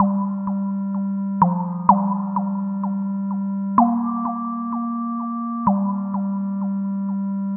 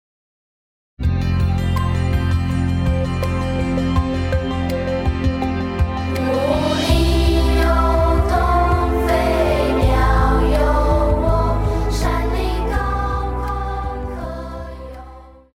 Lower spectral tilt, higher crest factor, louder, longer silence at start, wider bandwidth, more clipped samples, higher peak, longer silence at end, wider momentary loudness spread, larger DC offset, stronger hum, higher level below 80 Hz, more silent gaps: first, -12.5 dB/octave vs -7 dB/octave; first, 22 dB vs 14 dB; second, -22 LUFS vs -19 LUFS; second, 0 s vs 1 s; second, 2.2 kHz vs 15.5 kHz; neither; first, 0 dBFS vs -4 dBFS; second, 0 s vs 0.25 s; about the same, 7 LU vs 8 LU; neither; neither; second, -60 dBFS vs -22 dBFS; neither